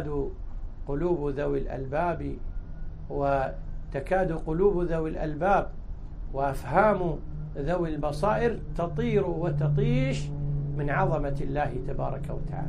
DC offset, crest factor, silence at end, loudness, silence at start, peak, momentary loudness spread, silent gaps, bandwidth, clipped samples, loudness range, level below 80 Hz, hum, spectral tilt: under 0.1%; 20 dB; 0 s; -28 LUFS; 0 s; -8 dBFS; 14 LU; none; 11 kHz; under 0.1%; 3 LU; -36 dBFS; none; -8 dB/octave